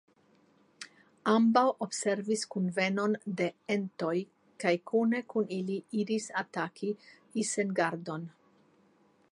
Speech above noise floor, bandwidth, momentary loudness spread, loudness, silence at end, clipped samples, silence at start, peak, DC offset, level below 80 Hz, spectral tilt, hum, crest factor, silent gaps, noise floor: 36 dB; 11.5 kHz; 14 LU; -31 LUFS; 1.05 s; under 0.1%; 0.8 s; -12 dBFS; under 0.1%; -84 dBFS; -5 dB/octave; none; 20 dB; none; -66 dBFS